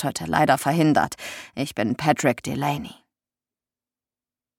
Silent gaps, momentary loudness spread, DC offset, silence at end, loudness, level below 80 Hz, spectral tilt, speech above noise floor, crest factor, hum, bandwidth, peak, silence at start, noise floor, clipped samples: none; 13 LU; under 0.1%; 1.65 s; -22 LUFS; -56 dBFS; -5 dB/octave; over 67 dB; 22 dB; none; 17 kHz; -4 dBFS; 0 s; under -90 dBFS; under 0.1%